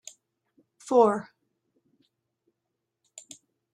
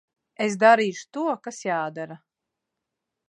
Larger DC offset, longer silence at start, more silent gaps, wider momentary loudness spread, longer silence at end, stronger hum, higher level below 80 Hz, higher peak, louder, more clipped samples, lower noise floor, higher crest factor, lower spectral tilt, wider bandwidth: neither; first, 0.85 s vs 0.4 s; neither; first, 26 LU vs 15 LU; first, 2.5 s vs 1.15 s; neither; about the same, -82 dBFS vs -82 dBFS; second, -8 dBFS vs -4 dBFS; about the same, -24 LUFS vs -23 LUFS; neither; about the same, -83 dBFS vs -84 dBFS; about the same, 24 dB vs 22 dB; about the same, -5.5 dB/octave vs -4.5 dB/octave; about the same, 11 kHz vs 10 kHz